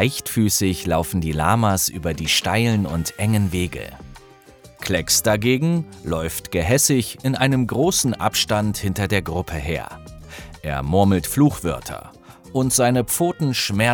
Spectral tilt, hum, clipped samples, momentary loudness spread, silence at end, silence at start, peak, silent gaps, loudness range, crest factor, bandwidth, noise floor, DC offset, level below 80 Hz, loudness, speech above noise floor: -4.5 dB/octave; none; under 0.1%; 11 LU; 0 s; 0 s; -2 dBFS; none; 3 LU; 18 dB; over 20 kHz; -47 dBFS; under 0.1%; -40 dBFS; -20 LUFS; 26 dB